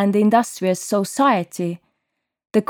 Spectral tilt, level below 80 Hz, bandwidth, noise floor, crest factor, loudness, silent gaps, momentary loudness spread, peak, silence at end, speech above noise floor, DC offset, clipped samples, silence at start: -5.5 dB/octave; -68 dBFS; 17.5 kHz; -77 dBFS; 16 dB; -19 LUFS; none; 11 LU; -4 dBFS; 0.05 s; 59 dB; under 0.1%; under 0.1%; 0 s